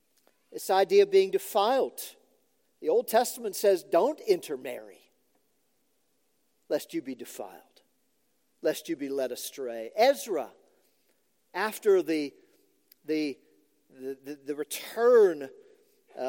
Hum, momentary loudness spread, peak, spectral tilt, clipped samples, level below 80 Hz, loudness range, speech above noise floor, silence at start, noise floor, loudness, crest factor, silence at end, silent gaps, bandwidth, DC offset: none; 19 LU; -10 dBFS; -3.5 dB/octave; under 0.1%; under -90 dBFS; 11 LU; 47 dB; 0.5 s; -75 dBFS; -27 LUFS; 20 dB; 0 s; none; 17 kHz; under 0.1%